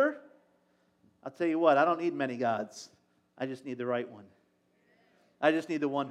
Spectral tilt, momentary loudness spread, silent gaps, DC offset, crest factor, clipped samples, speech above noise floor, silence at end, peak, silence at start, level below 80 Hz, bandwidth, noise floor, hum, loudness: -6 dB/octave; 22 LU; none; under 0.1%; 22 dB; under 0.1%; 41 dB; 0 s; -10 dBFS; 0 s; under -90 dBFS; 10.5 kHz; -71 dBFS; none; -30 LUFS